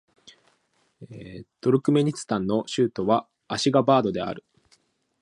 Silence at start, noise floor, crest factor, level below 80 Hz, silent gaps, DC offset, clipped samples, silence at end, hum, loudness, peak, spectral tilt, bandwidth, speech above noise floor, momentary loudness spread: 1 s; -68 dBFS; 20 dB; -62 dBFS; none; under 0.1%; under 0.1%; 0.8 s; none; -24 LUFS; -6 dBFS; -6 dB/octave; 11 kHz; 45 dB; 20 LU